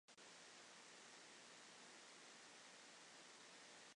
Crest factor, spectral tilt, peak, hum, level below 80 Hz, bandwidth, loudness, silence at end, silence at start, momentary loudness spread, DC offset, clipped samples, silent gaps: 14 dB; -0.5 dB/octave; -48 dBFS; none; under -90 dBFS; 11 kHz; -61 LUFS; 0 s; 0.1 s; 0 LU; under 0.1%; under 0.1%; none